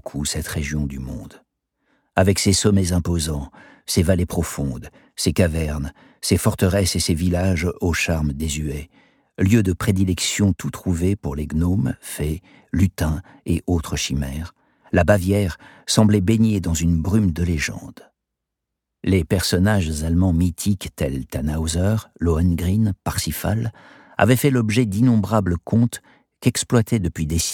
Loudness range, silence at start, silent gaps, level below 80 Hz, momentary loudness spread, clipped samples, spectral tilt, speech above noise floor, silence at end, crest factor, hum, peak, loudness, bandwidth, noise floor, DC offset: 3 LU; 0.05 s; none; -34 dBFS; 11 LU; under 0.1%; -5.5 dB/octave; 62 dB; 0 s; 18 dB; none; -2 dBFS; -21 LUFS; 18.5 kHz; -82 dBFS; under 0.1%